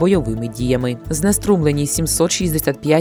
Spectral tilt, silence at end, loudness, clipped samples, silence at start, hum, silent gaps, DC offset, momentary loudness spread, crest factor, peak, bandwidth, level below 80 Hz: -5 dB/octave; 0 s; -18 LUFS; under 0.1%; 0 s; none; none; under 0.1%; 5 LU; 16 dB; -2 dBFS; over 20 kHz; -34 dBFS